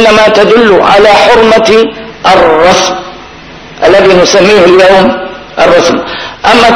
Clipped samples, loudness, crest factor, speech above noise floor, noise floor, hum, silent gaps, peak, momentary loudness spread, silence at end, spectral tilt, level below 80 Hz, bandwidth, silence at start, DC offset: 10%; -4 LUFS; 4 dB; 24 dB; -27 dBFS; none; none; 0 dBFS; 10 LU; 0 s; -4 dB/octave; -32 dBFS; 11 kHz; 0 s; under 0.1%